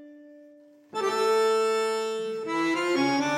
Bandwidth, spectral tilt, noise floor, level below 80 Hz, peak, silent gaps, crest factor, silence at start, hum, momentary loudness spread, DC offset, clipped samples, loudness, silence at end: 16 kHz; -3.5 dB/octave; -53 dBFS; -84 dBFS; -14 dBFS; none; 12 dB; 0 s; none; 8 LU; under 0.1%; under 0.1%; -26 LUFS; 0 s